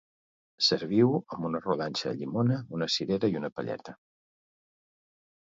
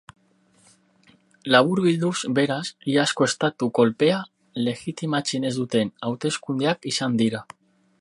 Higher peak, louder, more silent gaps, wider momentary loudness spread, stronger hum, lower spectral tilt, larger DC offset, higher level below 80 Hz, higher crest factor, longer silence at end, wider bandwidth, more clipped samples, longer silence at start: second, -10 dBFS vs 0 dBFS; second, -29 LUFS vs -23 LUFS; first, 3.52-3.56 s vs none; first, 11 LU vs 8 LU; neither; about the same, -5.5 dB/octave vs -4.5 dB/octave; neither; about the same, -66 dBFS vs -68 dBFS; about the same, 20 dB vs 24 dB; first, 1.5 s vs 0.55 s; second, 7.8 kHz vs 11.5 kHz; neither; second, 0.6 s vs 1.45 s